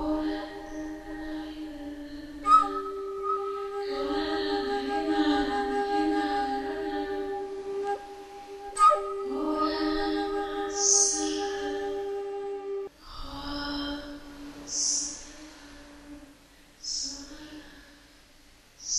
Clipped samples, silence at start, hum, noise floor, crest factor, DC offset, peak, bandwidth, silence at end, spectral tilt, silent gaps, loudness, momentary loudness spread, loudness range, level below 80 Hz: under 0.1%; 0 s; none; -56 dBFS; 22 dB; under 0.1%; -8 dBFS; 13 kHz; 0 s; -1.5 dB/octave; none; -28 LUFS; 22 LU; 8 LU; -52 dBFS